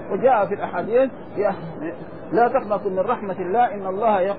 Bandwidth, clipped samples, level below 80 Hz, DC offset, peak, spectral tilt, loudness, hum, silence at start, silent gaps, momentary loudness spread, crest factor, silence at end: 4.9 kHz; under 0.1%; -56 dBFS; 0.8%; -6 dBFS; -10.5 dB/octave; -22 LUFS; none; 0 s; none; 11 LU; 16 dB; 0 s